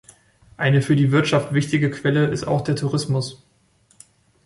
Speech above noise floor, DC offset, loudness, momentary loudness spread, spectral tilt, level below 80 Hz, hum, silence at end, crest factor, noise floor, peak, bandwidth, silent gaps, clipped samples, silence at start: 40 dB; under 0.1%; -20 LUFS; 7 LU; -6.5 dB/octave; -54 dBFS; none; 1.1 s; 16 dB; -60 dBFS; -4 dBFS; 11.5 kHz; none; under 0.1%; 0.6 s